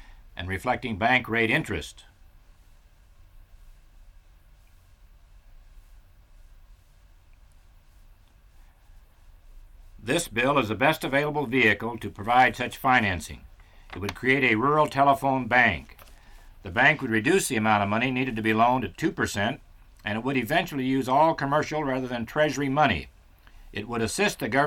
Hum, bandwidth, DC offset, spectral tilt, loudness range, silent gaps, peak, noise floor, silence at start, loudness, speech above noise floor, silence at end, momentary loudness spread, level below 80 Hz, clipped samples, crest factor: none; 18 kHz; under 0.1%; -4.5 dB/octave; 5 LU; none; -6 dBFS; -55 dBFS; 0.1 s; -24 LUFS; 30 dB; 0 s; 13 LU; -50 dBFS; under 0.1%; 20 dB